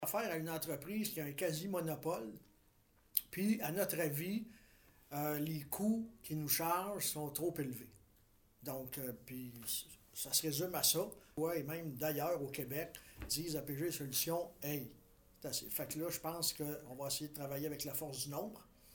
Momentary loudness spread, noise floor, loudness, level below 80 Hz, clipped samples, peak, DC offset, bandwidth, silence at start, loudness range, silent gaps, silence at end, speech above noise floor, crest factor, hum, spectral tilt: 11 LU; -71 dBFS; -40 LUFS; -68 dBFS; under 0.1%; -10 dBFS; under 0.1%; 19 kHz; 0 s; 4 LU; none; 0 s; 30 dB; 32 dB; none; -3.5 dB/octave